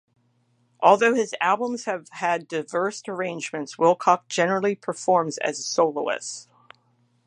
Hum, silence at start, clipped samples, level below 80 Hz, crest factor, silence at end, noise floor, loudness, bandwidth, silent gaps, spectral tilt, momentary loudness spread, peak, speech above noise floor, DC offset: none; 0.8 s; under 0.1%; -80 dBFS; 22 dB; 0.85 s; -66 dBFS; -23 LUFS; 11 kHz; none; -4 dB/octave; 11 LU; -2 dBFS; 43 dB; under 0.1%